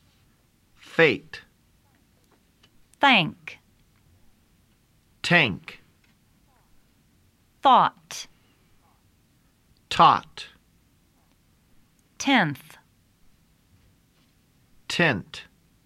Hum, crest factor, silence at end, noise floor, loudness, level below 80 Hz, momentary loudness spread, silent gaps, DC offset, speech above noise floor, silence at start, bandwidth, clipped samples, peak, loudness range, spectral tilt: none; 24 dB; 0.45 s; -63 dBFS; -21 LUFS; -62 dBFS; 24 LU; none; under 0.1%; 41 dB; 0.95 s; 15.5 kHz; under 0.1%; -4 dBFS; 6 LU; -4 dB/octave